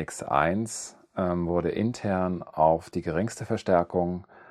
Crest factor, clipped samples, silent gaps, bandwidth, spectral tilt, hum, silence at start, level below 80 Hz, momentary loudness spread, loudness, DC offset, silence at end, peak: 20 dB; under 0.1%; none; 13 kHz; -6 dB/octave; none; 0 s; -56 dBFS; 8 LU; -27 LUFS; under 0.1%; 0.3 s; -6 dBFS